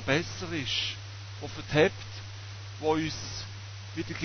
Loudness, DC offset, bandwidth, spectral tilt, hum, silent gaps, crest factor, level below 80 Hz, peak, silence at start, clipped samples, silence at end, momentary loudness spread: -31 LUFS; under 0.1%; 6.6 kHz; -4.5 dB/octave; none; none; 22 dB; -52 dBFS; -10 dBFS; 0 s; under 0.1%; 0 s; 16 LU